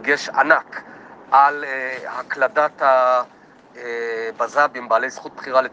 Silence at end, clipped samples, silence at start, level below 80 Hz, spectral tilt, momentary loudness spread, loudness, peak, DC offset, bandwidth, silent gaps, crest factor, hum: 0.05 s; under 0.1%; 0 s; -74 dBFS; -3 dB/octave; 15 LU; -19 LUFS; 0 dBFS; under 0.1%; 8.4 kHz; none; 20 dB; none